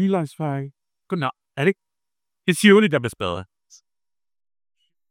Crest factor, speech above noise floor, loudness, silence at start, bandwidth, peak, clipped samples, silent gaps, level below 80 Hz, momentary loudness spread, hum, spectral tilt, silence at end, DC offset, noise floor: 22 dB; over 70 dB; -21 LUFS; 0 s; 16 kHz; 0 dBFS; under 0.1%; none; -66 dBFS; 17 LU; none; -5.5 dB/octave; 1.65 s; under 0.1%; under -90 dBFS